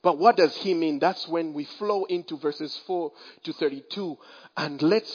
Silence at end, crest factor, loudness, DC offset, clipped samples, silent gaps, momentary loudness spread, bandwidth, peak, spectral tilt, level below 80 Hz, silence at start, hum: 0 s; 22 dB; -26 LUFS; under 0.1%; under 0.1%; none; 15 LU; 5.4 kHz; -4 dBFS; -6 dB/octave; -84 dBFS; 0.05 s; none